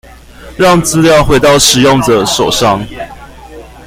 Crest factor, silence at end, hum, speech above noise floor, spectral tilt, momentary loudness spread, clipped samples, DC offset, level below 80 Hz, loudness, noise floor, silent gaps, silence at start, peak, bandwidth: 10 dB; 0.2 s; none; 24 dB; -4 dB/octave; 13 LU; 0.1%; under 0.1%; -28 dBFS; -8 LUFS; -32 dBFS; none; 0.4 s; 0 dBFS; over 20 kHz